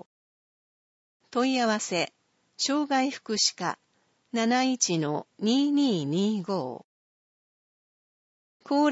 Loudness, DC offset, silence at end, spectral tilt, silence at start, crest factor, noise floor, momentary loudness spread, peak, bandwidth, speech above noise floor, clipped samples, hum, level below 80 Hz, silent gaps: -27 LUFS; under 0.1%; 0 s; -3.5 dB/octave; 1.35 s; 20 dB; under -90 dBFS; 9 LU; -10 dBFS; 8 kHz; over 64 dB; under 0.1%; none; -80 dBFS; 6.84-8.60 s